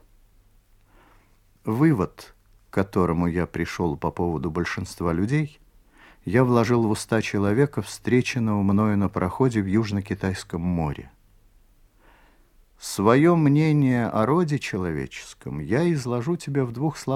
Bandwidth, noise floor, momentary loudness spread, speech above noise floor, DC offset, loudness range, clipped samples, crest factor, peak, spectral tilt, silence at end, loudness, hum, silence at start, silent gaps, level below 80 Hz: 15.5 kHz; -58 dBFS; 11 LU; 35 dB; under 0.1%; 5 LU; under 0.1%; 20 dB; -4 dBFS; -7 dB/octave; 0 s; -23 LUFS; none; 1.65 s; none; -48 dBFS